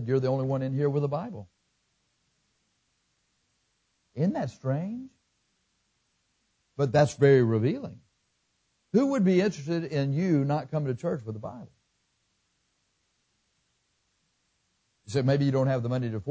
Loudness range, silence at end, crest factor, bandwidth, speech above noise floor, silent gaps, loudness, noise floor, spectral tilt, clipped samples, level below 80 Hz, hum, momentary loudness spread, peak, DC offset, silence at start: 12 LU; 0 s; 20 dB; 8 kHz; 48 dB; none; -27 LUFS; -74 dBFS; -8 dB/octave; under 0.1%; -64 dBFS; none; 17 LU; -8 dBFS; under 0.1%; 0 s